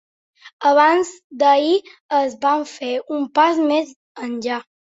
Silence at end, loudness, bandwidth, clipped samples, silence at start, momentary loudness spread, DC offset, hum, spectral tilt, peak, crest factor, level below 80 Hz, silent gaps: 0.25 s; -18 LUFS; 8 kHz; under 0.1%; 0.45 s; 12 LU; under 0.1%; none; -3 dB/octave; -2 dBFS; 18 dB; -70 dBFS; 0.53-0.59 s, 1.24-1.30 s, 2.00-2.09 s, 3.96-4.15 s